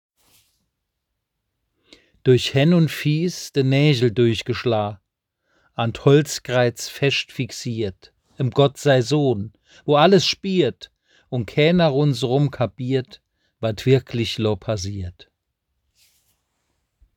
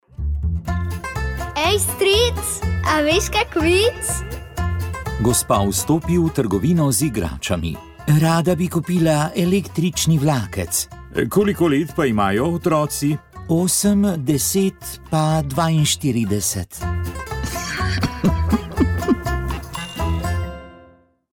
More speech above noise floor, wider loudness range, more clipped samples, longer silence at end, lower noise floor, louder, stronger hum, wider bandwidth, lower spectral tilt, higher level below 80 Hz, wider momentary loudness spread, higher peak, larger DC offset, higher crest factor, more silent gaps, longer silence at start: first, 59 dB vs 33 dB; about the same, 5 LU vs 3 LU; neither; first, 2.05 s vs 0.55 s; first, -78 dBFS vs -51 dBFS; about the same, -20 LUFS vs -19 LUFS; neither; about the same, 19 kHz vs 18.5 kHz; about the same, -6 dB/octave vs -5 dB/octave; second, -56 dBFS vs -32 dBFS; first, 12 LU vs 9 LU; first, 0 dBFS vs -4 dBFS; neither; first, 20 dB vs 14 dB; neither; first, 2.25 s vs 0.2 s